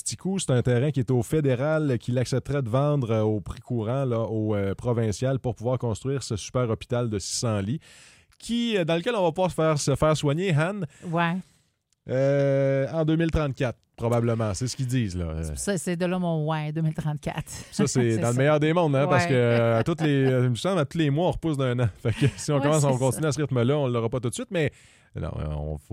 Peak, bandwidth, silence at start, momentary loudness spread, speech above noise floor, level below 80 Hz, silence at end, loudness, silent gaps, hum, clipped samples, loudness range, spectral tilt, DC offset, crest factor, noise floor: -8 dBFS; 15 kHz; 0.05 s; 8 LU; 45 dB; -46 dBFS; 0.15 s; -25 LUFS; none; none; under 0.1%; 5 LU; -6 dB/octave; under 0.1%; 16 dB; -69 dBFS